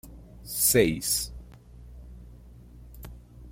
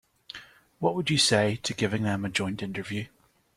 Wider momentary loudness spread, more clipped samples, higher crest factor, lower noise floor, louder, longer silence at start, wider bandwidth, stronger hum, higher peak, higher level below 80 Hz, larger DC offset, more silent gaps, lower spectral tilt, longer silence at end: first, 27 LU vs 22 LU; neither; about the same, 24 dB vs 20 dB; about the same, -48 dBFS vs -49 dBFS; first, -24 LUFS vs -27 LUFS; second, 0.05 s vs 0.3 s; about the same, 16.5 kHz vs 15 kHz; neither; about the same, -8 dBFS vs -8 dBFS; first, -46 dBFS vs -60 dBFS; neither; neither; about the same, -3 dB/octave vs -4 dB/octave; second, 0 s vs 0.5 s